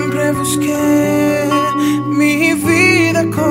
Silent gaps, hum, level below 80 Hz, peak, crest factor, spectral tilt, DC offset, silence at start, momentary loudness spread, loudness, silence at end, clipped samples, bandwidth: none; none; -48 dBFS; 0 dBFS; 14 dB; -5 dB/octave; under 0.1%; 0 s; 6 LU; -13 LUFS; 0 s; under 0.1%; 16.5 kHz